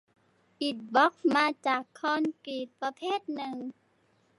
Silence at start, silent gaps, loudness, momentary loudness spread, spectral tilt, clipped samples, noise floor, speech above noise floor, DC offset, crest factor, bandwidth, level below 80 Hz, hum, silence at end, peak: 0.6 s; none; -30 LUFS; 13 LU; -4 dB/octave; under 0.1%; -69 dBFS; 39 dB; under 0.1%; 20 dB; 11.5 kHz; -86 dBFS; none; 0.7 s; -12 dBFS